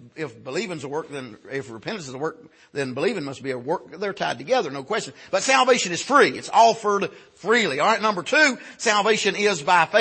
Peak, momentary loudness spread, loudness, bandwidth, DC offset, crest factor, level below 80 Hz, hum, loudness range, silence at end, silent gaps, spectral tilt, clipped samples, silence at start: -4 dBFS; 15 LU; -22 LUFS; 8.8 kHz; under 0.1%; 20 dB; -70 dBFS; none; 10 LU; 0 s; none; -3 dB/octave; under 0.1%; 0 s